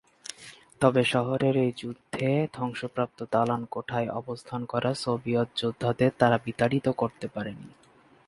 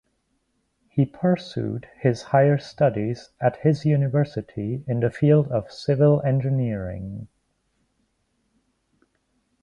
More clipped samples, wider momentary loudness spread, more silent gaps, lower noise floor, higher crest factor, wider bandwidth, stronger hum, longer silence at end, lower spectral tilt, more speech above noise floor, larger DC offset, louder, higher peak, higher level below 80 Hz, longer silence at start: neither; about the same, 13 LU vs 11 LU; neither; second, -50 dBFS vs -71 dBFS; first, 24 dB vs 18 dB; first, 11.5 kHz vs 7.2 kHz; neither; second, 0.6 s vs 2.35 s; second, -6.5 dB/octave vs -9 dB/octave; second, 23 dB vs 49 dB; neither; second, -27 LUFS vs -23 LUFS; about the same, -4 dBFS vs -6 dBFS; second, -62 dBFS vs -54 dBFS; second, 0.4 s vs 0.95 s